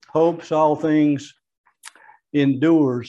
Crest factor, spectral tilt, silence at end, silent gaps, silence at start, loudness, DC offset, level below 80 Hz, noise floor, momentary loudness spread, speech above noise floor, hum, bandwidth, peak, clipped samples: 14 dB; -7.5 dB/octave; 0 s; 1.58-1.64 s; 0.15 s; -19 LUFS; under 0.1%; -68 dBFS; -46 dBFS; 5 LU; 28 dB; none; 11.5 kHz; -6 dBFS; under 0.1%